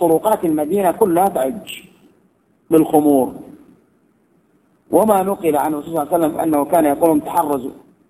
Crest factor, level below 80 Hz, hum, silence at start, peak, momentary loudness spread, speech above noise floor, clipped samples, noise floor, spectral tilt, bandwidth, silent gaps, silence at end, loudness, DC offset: 16 dB; -56 dBFS; none; 0 s; 0 dBFS; 10 LU; 42 dB; under 0.1%; -58 dBFS; -6 dB/octave; 15.5 kHz; none; 0.35 s; -16 LUFS; under 0.1%